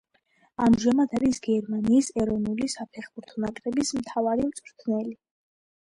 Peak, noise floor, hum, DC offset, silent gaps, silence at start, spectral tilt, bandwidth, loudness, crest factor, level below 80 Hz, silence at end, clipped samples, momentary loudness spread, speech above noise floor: -10 dBFS; -66 dBFS; none; under 0.1%; none; 0.6 s; -5.5 dB/octave; 11.5 kHz; -26 LUFS; 16 dB; -54 dBFS; 0.7 s; under 0.1%; 14 LU; 41 dB